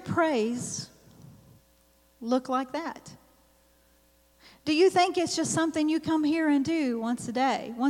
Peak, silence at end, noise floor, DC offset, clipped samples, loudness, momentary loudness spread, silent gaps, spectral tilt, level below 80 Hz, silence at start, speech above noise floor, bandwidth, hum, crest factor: -10 dBFS; 0 s; -63 dBFS; under 0.1%; under 0.1%; -27 LUFS; 14 LU; none; -4 dB/octave; -66 dBFS; 0 s; 37 dB; 15.5 kHz; none; 18 dB